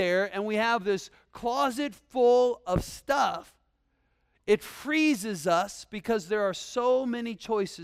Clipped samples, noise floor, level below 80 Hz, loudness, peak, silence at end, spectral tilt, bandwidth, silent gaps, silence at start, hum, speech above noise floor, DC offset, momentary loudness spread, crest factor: under 0.1%; -72 dBFS; -52 dBFS; -28 LUFS; -12 dBFS; 0 s; -4.5 dB/octave; 15.5 kHz; none; 0 s; none; 45 dB; under 0.1%; 10 LU; 16 dB